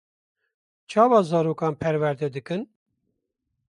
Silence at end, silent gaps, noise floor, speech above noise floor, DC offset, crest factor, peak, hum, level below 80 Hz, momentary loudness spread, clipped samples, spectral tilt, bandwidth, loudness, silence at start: 1.05 s; none; -79 dBFS; 56 dB; under 0.1%; 20 dB; -6 dBFS; none; -64 dBFS; 14 LU; under 0.1%; -7.5 dB/octave; 11 kHz; -23 LUFS; 0.9 s